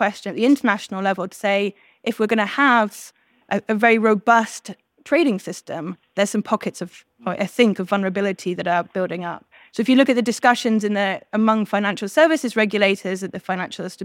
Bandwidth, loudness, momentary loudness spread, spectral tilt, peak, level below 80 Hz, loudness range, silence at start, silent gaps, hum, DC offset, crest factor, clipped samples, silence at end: 16.5 kHz; -20 LUFS; 13 LU; -5 dB/octave; -2 dBFS; -74 dBFS; 4 LU; 0 s; none; none; under 0.1%; 18 dB; under 0.1%; 0 s